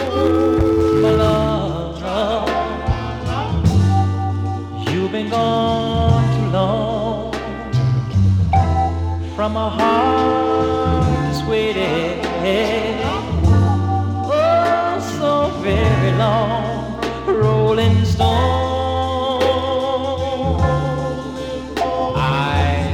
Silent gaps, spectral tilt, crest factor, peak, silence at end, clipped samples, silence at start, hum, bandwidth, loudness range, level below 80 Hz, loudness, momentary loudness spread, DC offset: none; -7 dB/octave; 16 dB; -2 dBFS; 0 s; under 0.1%; 0 s; none; 11.5 kHz; 2 LU; -32 dBFS; -18 LUFS; 8 LU; under 0.1%